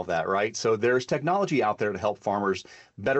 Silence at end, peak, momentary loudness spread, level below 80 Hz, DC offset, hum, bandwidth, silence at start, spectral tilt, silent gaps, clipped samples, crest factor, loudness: 0 s; -14 dBFS; 5 LU; -64 dBFS; under 0.1%; none; 8.4 kHz; 0 s; -5 dB/octave; none; under 0.1%; 12 dB; -26 LUFS